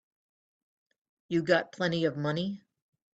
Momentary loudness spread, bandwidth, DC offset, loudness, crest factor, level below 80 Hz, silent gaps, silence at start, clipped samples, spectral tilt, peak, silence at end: 9 LU; 8 kHz; under 0.1%; -30 LUFS; 22 dB; -72 dBFS; none; 1.3 s; under 0.1%; -6.5 dB/octave; -12 dBFS; 0.55 s